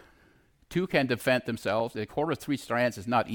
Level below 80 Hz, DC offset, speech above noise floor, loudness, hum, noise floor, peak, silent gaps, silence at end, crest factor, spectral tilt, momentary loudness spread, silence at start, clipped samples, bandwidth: -60 dBFS; under 0.1%; 34 dB; -29 LUFS; none; -62 dBFS; -12 dBFS; none; 0 s; 18 dB; -5.5 dB/octave; 6 LU; 0.7 s; under 0.1%; 19 kHz